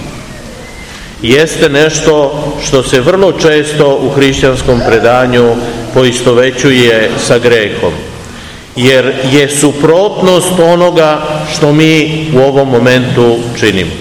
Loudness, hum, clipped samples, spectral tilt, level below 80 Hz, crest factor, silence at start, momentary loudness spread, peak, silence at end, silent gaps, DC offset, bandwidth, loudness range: -8 LUFS; none; 5%; -4.5 dB/octave; -30 dBFS; 8 dB; 0 s; 15 LU; 0 dBFS; 0 s; none; 0.7%; 17.5 kHz; 2 LU